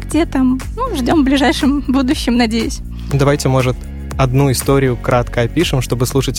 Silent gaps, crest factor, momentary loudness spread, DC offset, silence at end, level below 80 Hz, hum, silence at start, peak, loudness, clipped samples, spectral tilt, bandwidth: none; 12 dB; 7 LU; under 0.1%; 0 s; -26 dBFS; none; 0 s; -2 dBFS; -15 LUFS; under 0.1%; -5.5 dB/octave; 16.5 kHz